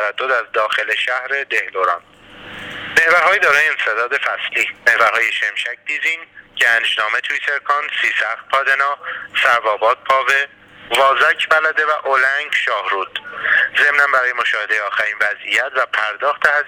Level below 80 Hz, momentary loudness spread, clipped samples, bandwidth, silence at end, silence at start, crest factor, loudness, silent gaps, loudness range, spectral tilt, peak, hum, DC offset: -60 dBFS; 8 LU; under 0.1%; over 20 kHz; 0 s; 0 s; 18 dB; -16 LUFS; none; 2 LU; -0.5 dB/octave; 0 dBFS; none; under 0.1%